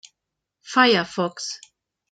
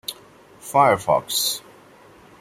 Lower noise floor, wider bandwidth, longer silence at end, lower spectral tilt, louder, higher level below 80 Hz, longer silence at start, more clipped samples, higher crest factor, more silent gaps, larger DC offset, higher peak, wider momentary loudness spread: first, -83 dBFS vs -49 dBFS; second, 9.2 kHz vs 16.5 kHz; second, 0.55 s vs 0.8 s; about the same, -3.5 dB/octave vs -2.5 dB/octave; about the same, -21 LUFS vs -20 LUFS; second, -72 dBFS vs -60 dBFS; first, 0.65 s vs 0.1 s; neither; about the same, 20 dB vs 20 dB; neither; neither; about the same, -4 dBFS vs -4 dBFS; about the same, 15 LU vs 16 LU